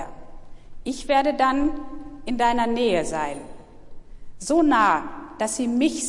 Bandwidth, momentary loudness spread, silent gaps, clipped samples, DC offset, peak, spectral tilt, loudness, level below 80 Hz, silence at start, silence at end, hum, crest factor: 11.5 kHz; 17 LU; none; under 0.1%; under 0.1%; -8 dBFS; -3.5 dB/octave; -22 LUFS; -42 dBFS; 0 s; 0 s; none; 16 dB